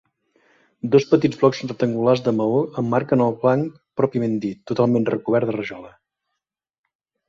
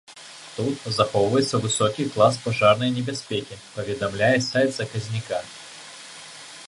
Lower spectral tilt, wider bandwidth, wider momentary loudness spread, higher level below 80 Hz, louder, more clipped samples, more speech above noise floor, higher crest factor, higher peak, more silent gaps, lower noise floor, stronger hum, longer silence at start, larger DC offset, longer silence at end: first, -7.5 dB/octave vs -4.5 dB/octave; second, 7.4 kHz vs 11.5 kHz; second, 9 LU vs 19 LU; about the same, -62 dBFS vs -58 dBFS; first, -20 LUFS vs -23 LUFS; neither; first, 63 dB vs 20 dB; about the same, 18 dB vs 20 dB; about the same, -2 dBFS vs -4 dBFS; neither; first, -82 dBFS vs -43 dBFS; neither; first, 0.85 s vs 0.1 s; neither; first, 1.4 s vs 0 s